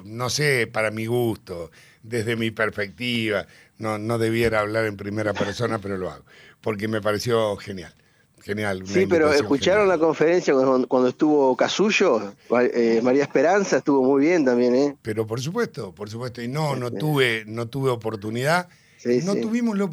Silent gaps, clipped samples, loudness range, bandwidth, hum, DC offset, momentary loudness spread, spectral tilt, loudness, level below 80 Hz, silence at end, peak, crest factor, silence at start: none; under 0.1%; 7 LU; 15 kHz; none; under 0.1%; 12 LU; -5.5 dB/octave; -22 LUFS; -56 dBFS; 0 s; -4 dBFS; 18 dB; 0 s